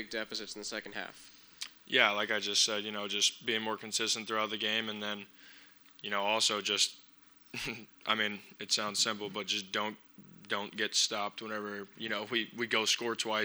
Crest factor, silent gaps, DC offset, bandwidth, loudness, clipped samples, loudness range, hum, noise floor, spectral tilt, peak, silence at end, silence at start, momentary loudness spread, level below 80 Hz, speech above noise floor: 26 dB; none; under 0.1%; over 20 kHz; -32 LUFS; under 0.1%; 4 LU; none; -60 dBFS; -1 dB/octave; -8 dBFS; 0 s; 0 s; 14 LU; -76 dBFS; 26 dB